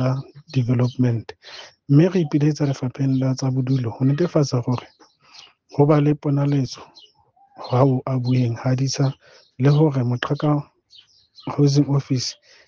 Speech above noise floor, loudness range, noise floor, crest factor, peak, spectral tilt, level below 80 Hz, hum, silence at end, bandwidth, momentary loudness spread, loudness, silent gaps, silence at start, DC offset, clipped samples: 38 dB; 2 LU; -57 dBFS; 18 dB; -4 dBFS; -7.5 dB/octave; -58 dBFS; none; 0.35 s; 7.2 kHz; 12 LU; -21 LUFS; none; 0 s; under 0.1%; under 0.1%